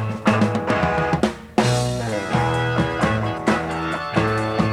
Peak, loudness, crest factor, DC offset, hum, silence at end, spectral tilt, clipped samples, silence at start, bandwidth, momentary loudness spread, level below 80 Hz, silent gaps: -4 dBFS; -21 LUFS; 18 dB; under 0.1%; none; 0 s; -6 dB/octave; under 0.1%; 0 s; 13.5 kHz; 3 LU; -40 dBFS; none